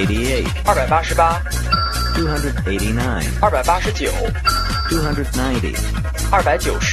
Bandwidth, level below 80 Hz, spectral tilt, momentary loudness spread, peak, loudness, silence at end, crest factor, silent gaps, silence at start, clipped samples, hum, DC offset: 13 kHz; -22 dBFS; -4.5 dB/octave; 5 LU; 0 dBFS; -18 LUFS; 0 s; 16 dB; none; 0 s; under 0.1%; none; under 0.1%